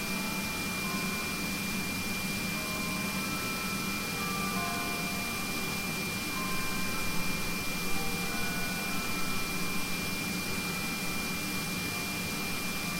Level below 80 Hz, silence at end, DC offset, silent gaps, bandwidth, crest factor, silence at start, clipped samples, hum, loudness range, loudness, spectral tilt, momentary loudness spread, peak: -48 dBFS; 0 s; under 0.1%; none; 16 kHz; 14 dB; 0 s; under 0.1%; none; 0 LU; -32 LUFS; -3 dB/octave; 1 LU; -18 dBFS